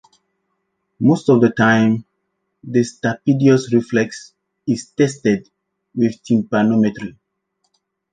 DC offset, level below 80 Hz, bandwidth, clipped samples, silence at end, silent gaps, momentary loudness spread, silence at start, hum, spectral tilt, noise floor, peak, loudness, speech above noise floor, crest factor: under 0.1%; -58 dBFS; 9.4 kHz; under 0.1%; 1.05 s; none; 11 LU; 1 s; none; -6.5 dB/octave; -72 dBFS; -2 dBFS; -17 LUFS; 56 dB; 16 dB